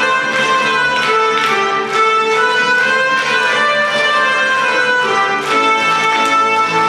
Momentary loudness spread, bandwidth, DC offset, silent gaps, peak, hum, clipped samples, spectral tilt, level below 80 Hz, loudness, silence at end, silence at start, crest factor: 2 LU; 14 kHz; under 0.1%; none; -2 dBFS; none; under 0.1%; -2 dB/octave; -58 dBFS; -12 LUFS; 0 s; 0 s; 12 dB